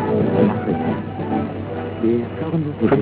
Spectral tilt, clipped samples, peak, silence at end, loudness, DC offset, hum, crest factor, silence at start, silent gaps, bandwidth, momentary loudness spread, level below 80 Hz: -12.5 dB/octave; under 0.1%; -4 dBFS; 0 s; -21 LUFS; under 0.1%; none; 16 dB; 0 s; none; 4 kHz; 8 LU; -44 dBFS